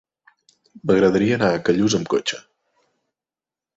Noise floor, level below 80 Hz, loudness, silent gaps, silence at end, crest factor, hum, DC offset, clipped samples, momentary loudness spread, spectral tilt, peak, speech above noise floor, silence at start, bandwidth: under -90 dBFS; -54 dBFS; -19 LUFS; none; 1.4 s; 18 dB; none; under 0.1%; under 0.1%; 11 LU; -5 dB/octave; -4 dBFS; over 72 dB; 0.85 s; 8 kHz